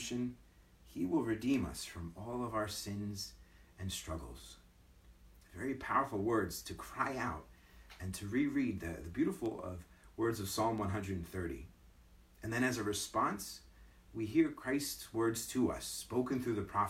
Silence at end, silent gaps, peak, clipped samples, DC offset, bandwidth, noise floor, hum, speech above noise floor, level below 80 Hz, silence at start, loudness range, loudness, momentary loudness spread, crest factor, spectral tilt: 0 s; none; -18 dBFS; under 0.1%; under 0.1%; 16.5 kHz; -62 dBFS; none; 25 dB; -60 dBFS; 0 s; 6 LU; -38 LUFS; 14 LU; 20 dB; -5 dB/octave